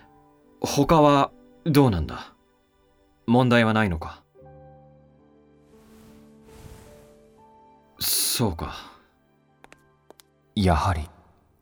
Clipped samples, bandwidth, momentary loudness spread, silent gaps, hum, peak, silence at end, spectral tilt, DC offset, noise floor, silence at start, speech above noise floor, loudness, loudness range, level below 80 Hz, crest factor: under 0.1%; over 20 kHz; 18 LU; none; none; -4 dBFS; 0.55 s; -5 dB/octave; under 0.1%; -63 dBFS; 0.6 s; 42 dB; -22 LUFS; 8 LU; -42 dBFS; 22 dB